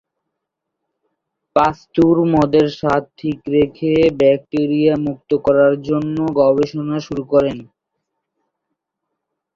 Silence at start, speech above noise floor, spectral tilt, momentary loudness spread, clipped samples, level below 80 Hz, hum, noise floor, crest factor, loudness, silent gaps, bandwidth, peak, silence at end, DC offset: 1.55 s; 63 dB; -8 dB/octave; 9 LU; under 0.1%; -48 dBFS; none; -79 dBFS; 16 dB; -16 LUFS; none; 7.4 kHz; -2 dBFS; 1.95 s; under 0.1%